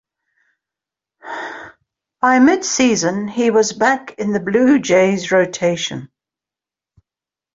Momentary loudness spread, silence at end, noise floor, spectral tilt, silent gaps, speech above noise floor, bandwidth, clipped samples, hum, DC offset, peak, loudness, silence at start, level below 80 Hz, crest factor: 15 LU; 1.5 s; -89 dBFS; -4 dB/octave; none; 74 dB; 7.8 kHz; under 0.1%; none; under 0.1%; -2 dBFS; -15 LUFS; 1.25 s; -58 dBFS; 16 dB